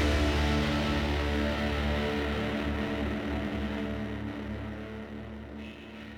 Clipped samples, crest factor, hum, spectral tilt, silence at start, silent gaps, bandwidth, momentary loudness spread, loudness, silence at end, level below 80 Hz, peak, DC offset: under 0.1%; 14 dB; none; -6 dB/octave; 0 s; none; 15.5 kHz; 14 LU; -31 LUFS; 0 s; -36 dBFS; -16 dBFS; under 0.1%